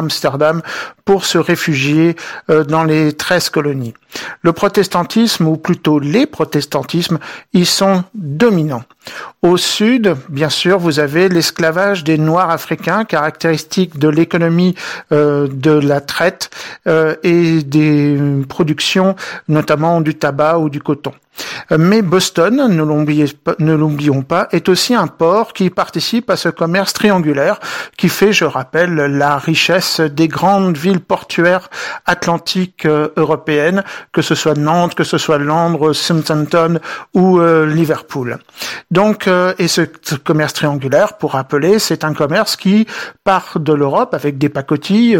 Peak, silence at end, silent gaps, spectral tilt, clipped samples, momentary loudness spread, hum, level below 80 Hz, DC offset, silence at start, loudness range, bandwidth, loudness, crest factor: 0 dBFS; 0 s; none; -5.5 dB/octave; under 0.1%; 7 LU; none; -54 dBFS; under 0.1%; 0 s; 2 LU; 17 kHz; -13 LUFS; 12 dB